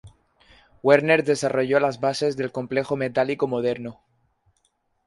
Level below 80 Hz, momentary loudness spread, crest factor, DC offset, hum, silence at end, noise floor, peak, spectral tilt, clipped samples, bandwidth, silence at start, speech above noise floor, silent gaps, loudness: -62 dBFS; 9 LU; 20 dB; under 0.1%; none; 1.15 s; -70 dBFS; -2 dBFS; -5.5 dB/octave; under 0.1%; 11.5 kHz; 0.05 s; 48 dB; none; -22 LUFS